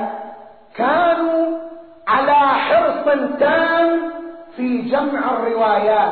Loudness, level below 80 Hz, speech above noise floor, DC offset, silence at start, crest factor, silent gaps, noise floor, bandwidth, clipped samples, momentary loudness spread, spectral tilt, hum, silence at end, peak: -17 LUFS; -58 dBFS; 22 dB; 0.3%; 0 s; 12 dB; none; -39 dBFS; 4.6 kHz; under 0.1%; 16 LU; -2 dB/octave; none; 0 s; -4 dBFS